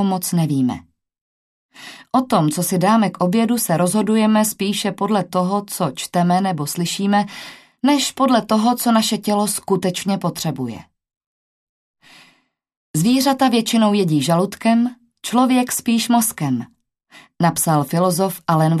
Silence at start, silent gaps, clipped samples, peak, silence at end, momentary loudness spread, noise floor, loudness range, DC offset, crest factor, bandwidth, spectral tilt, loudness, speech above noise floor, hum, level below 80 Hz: 0 s; 1.21-1.69 s, 11.26-11.94 s, 12.77-12.94 s; under 0.1%; -2 dBFS; 0 s; 8 LU; -59 dBFS; 5 LU; under 0.1%; 16 dB; 14 kHz; -5 dB/octave; -18 LUFS; 42 dB; none; -62 dBFS